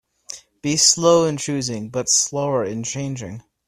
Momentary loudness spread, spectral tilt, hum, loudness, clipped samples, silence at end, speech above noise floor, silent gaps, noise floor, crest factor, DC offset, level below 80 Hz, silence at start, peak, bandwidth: 20 LU; -3 dB/octave; none; -19 LUFS; under 0.1%; 0.3 s; 21 dB; none; -40 dBFS; 20 dB; under 0.1%; -58 dBFS; 0.3 s; -2 dBFS; 14.5 kHz